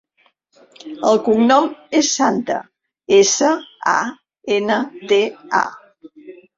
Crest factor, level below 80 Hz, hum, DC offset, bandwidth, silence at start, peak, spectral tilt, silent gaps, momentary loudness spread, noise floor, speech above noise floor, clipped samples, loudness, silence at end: 16 dB; -62 dBFS; none; under 0.1%; 7.8 kHz; 0.85 s; -2 dBFS; -3 dB/octave; none; 12 LU; -61 dBFS; 45 dB; under 0.1%; -17 LUFS; 0.25 s